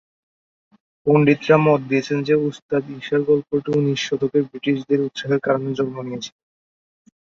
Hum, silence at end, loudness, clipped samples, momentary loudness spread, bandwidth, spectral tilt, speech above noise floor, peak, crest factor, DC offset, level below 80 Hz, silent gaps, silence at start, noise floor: none; 0.95 s; -20 LUFS; under 0.1%; 10 LU; 7.6 kHz; -6.5 dB/octave; over 71 dB; -2 dBFS; 18 dB; under 0.1%; -62 dBFS; 2.62-2.69 s; 1.05 s; under -90 dBFS